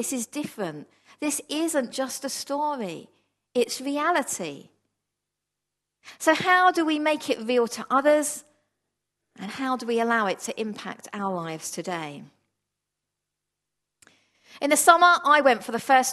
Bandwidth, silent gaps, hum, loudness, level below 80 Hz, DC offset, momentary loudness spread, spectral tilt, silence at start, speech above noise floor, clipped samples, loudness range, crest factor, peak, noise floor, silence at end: 13 kHz; none; 50 Hz at -75 dBFS; -24 LUFS; -78 dBFS; under 0.1%; 16 LU; -2.5 dB/octave; 0 s; 60 dB; under 0.1%; 11 LU; 26 dB; 0 dBFS; -84 dBFS; 0 s